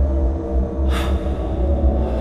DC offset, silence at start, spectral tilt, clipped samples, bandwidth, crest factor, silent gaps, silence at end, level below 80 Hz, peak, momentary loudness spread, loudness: under 0.1%; 0 s; -8 dB/octave; under 0.1%; 9.8 kHz; 12 dB; none; 0 s; -20 dBFS; -6 dBFS; 4 LU; -21 LUFS